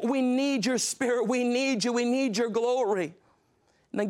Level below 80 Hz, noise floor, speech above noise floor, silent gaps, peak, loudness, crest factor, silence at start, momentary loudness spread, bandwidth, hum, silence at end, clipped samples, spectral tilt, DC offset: -78 dBFS; -67 dBFS; 41 dB; none; -16 dBFS; -27 LUFS; 12 dB; 0 s; 3 LU; 15.5 kHz; none; 0 s; under 0.1%; -3.5 dB/octave; under 0.1%